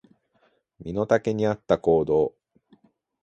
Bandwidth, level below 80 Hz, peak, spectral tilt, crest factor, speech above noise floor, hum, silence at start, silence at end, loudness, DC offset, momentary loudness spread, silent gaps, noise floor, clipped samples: 8 kHz; -54 dBFS; -4 dBFS; -7.5 dB/octave; 20 dB; 44 dB; none; 0.8 s; 0.95 s; -24 LUFS; under 0.1%; 10 LU; none; -67 dBFS; under 0.1%